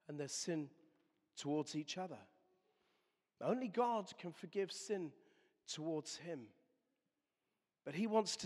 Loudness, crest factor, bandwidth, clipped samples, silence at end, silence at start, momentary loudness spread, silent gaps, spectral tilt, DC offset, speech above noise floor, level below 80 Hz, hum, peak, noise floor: -43 LUFS; 22 dB; 13.5 kHz; under 0.1%; 0 s; 0.1 s; 15 LU; none; -4 dB/octave; under 0.1%; over 48 dB; under -90 dBFS; none; -22 dBFS; under -90 dBFS